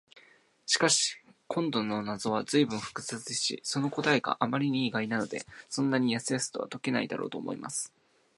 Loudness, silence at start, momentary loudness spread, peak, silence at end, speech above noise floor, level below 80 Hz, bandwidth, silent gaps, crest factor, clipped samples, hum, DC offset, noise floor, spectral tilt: -30 LUFS; 0.15 s; 10 LU; -10 dBFS; 0.5 s; 31 dB; -74 dBFS; 11.5 kHz; none; 22 dB; under 0.1%; none; under 0.1%; -61 dBFS; -3.5 dB/octave